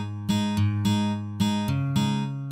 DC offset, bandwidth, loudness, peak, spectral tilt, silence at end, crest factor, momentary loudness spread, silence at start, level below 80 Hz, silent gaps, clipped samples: under 0.1%; 14 kHz; -26 LUFS; -12 dBFS; -6 dB/octave; 0 s; 14 dB; 3 LU; 0 s; -56 dBFS; none; under 0.1%